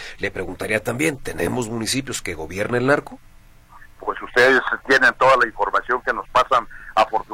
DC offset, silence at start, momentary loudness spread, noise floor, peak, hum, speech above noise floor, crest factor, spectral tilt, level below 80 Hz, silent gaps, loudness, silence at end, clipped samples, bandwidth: under 0.1%; 0 s; 12 LU; -46 dBFS; -2 dBFS; none; 26 dB; 18 dB; -4 dB/octave; -44 dBFS; none; -20 LUFS; 0 s; under 0.1%; 16.5 kHz